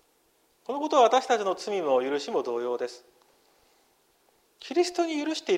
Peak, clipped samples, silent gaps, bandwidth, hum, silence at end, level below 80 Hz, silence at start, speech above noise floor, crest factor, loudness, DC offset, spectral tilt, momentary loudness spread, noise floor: -8 dBFS; under 0.1%; none; 15 kHz; none; 0 s; -80 dBFS; 0.7 s; 41 dB; 20 dB; -27 LUFS; under 0.1%; -3 dB/octave; 14 LU; -67 dBFS